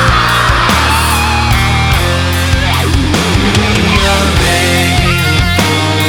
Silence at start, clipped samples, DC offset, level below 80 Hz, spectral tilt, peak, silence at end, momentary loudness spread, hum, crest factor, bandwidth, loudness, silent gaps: 0 s; under 0.1%; under 0.1%; -18 dBFS; -4 dB/octave; 0 dBFS; 0 s; 2 LU; none; 10 dB; over 20 kHz; -10 LUFS; none